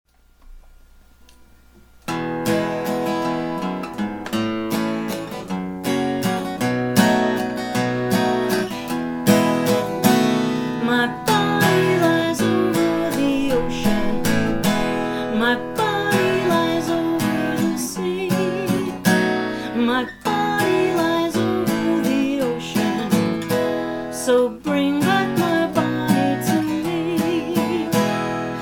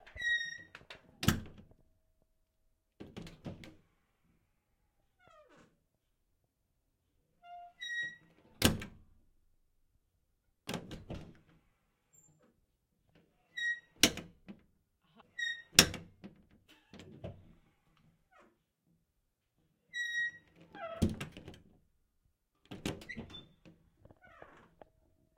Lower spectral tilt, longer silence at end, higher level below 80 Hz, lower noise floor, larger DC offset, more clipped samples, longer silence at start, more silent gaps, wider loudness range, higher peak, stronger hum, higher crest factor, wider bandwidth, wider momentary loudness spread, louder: first, -5 dB/octave vs -2.5 dB/octave; second, 0 s vs 0.9 s; first, -44 dBFS vs -60 dBFS; second, -49 dBFS vs -82 dBFS; neither; neither; first, 0.45 s vs 0.05 s; neither; second, 6 LU vs 23 LU; about the same, 0 dBFS vs -2 dBFS; neither; second, 20 dB vs 40 dB; first, over 20 kHz vs 16 kHz; second, 7 LU vs 27 LU; first, -20 LUFS vs -34 LUFS